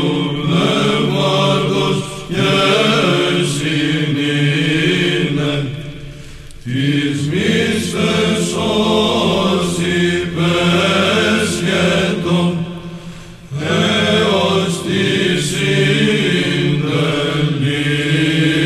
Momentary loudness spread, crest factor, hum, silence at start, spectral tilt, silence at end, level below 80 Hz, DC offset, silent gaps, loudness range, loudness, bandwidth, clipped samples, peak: 8 LU; 14 dB; none; 0 s; -5 dB/octave; 0 s; -42 dBFS; under 0.1%; none; 3 LU; -15 LUFS; 13.5 kHz; under 0.1%; -2 dBFS